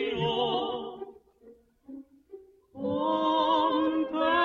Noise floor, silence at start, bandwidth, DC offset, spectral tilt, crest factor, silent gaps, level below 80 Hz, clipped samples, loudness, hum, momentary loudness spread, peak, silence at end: -57 dBFS; 0 s; 7 kHz; under 0.1%; -6.5 dB/octave; 16 dB; none; -64 dBFS; under 0.1%; -28 LUFS; none; 23 LU; -12 dBFS; 0 s